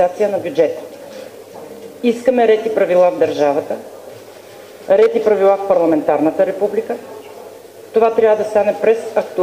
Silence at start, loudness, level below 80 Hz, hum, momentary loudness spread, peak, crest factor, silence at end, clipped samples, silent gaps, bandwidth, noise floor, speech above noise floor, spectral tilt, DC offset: 0 s; -15 LUFS; -62 dBFS; none; 22 LU; 0 dBFS; 16 dB; 0 s; under 0.1%; none; 16 kHz; -37 dBFS; 23 dB; -6 dB/octave; under 0.1%